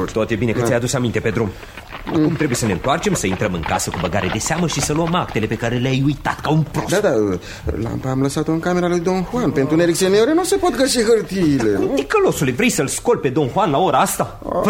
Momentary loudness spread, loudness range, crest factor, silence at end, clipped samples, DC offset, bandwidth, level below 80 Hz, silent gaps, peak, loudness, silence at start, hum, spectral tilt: 6 LU; 3 LU; 14 dB; 0 s; under 0.1%; under 0.1%; 16.5 kHz; -38 dBFS; none; -4 dBFS; -18 LUFS; 0 s; none; -5 dB/octave